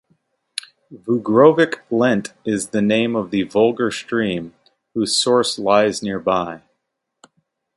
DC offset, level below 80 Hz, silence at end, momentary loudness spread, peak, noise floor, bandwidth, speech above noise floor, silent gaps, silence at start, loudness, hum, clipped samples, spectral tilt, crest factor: under 0.1%; -58 dBFS; 1.2 s; 18 LU; 0 dBFS; -76 dBFS; 11.5 kHz; 58 dB; none; 0.9 s; -18 LUFS; none; under 0.1%; -4.5 dB/octave; 18 dB